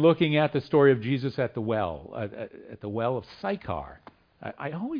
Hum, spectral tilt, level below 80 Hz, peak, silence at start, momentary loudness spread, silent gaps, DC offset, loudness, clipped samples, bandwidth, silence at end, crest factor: none; -9 dB/octave; -58 dBFS; -8 dBFS; 0 s; 19 LU; none; under 0.1%; -27 LUFS; under 0.1%; 5.2 kHz; 0 s; 18 dB